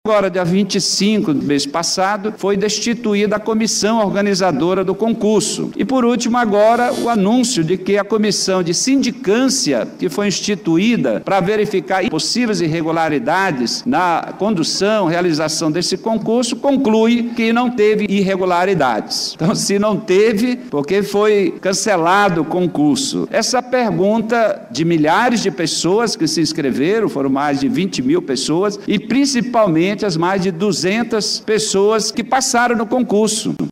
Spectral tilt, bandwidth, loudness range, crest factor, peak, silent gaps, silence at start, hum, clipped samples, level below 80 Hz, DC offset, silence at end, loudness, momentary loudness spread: -4 dB/octave; 16 kHz; 1 LU; 10 dB; -4 dBFS; none; 0.05 s; none; under 0.1%; -54 dBFS; under 0.1%; 0 s; -16 LUFS; 4 LU